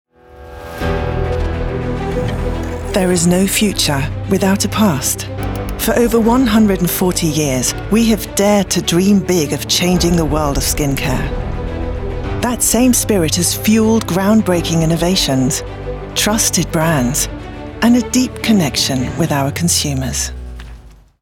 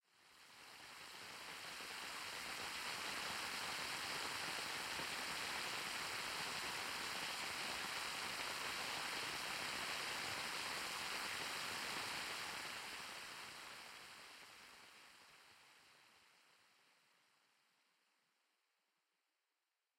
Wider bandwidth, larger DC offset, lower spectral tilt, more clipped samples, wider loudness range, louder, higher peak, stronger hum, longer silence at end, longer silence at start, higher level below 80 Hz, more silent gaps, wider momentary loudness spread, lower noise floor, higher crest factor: first, 19.5 kHz vs 16 kHz; neither; first, -4.5 dB/octave vs -0.5 dB/octave; neither; second, 3 LU vs 13 LU; first, -15 LUFS vs -44 LUFS; first, 0 dBFS vs -30 dBFS; neither; second, 0.3 s vs 3.55 s; about the same, 0.3 s vs 0.2 s; first, -28 dBFS vs -78 dBFS; neither; second, 10 LU vs 15 LU; second, -38 dBFS vs under -90 dBFS; about the same, 14 dB vs 18 dB